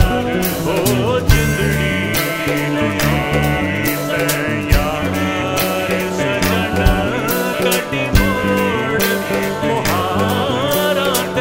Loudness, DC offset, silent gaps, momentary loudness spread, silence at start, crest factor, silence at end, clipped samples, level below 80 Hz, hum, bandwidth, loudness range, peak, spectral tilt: -16 LUFS; 0.3%; none; 3 LU; 0 s; 16 dB; 0 s; under 0.1%; -26 dBFS; none; 16.5 kHz; 1 LU; 0 dBFS; -4.5 dB/octave